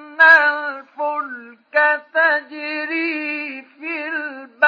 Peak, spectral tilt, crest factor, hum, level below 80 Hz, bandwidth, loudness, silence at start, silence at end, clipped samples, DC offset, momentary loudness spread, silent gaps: 0 dBFS; -2.5 dB/octave; 18 dB; none; under -90 dBFS; 7 kHz; -17 LUFS; 0 s; 0 s; under 0.1%; under 0.1%; 19 LU; none